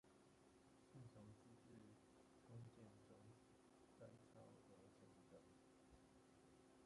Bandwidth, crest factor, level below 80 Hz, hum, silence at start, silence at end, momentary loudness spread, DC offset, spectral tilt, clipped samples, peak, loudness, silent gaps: 11 kHz; 16 dB; -86 dBFS; none; 0.05 s; 0 s; 6 LU; under 0.1%; -6 dB/octave; under 0.1%; -52 dBFS; -67 LUFS; none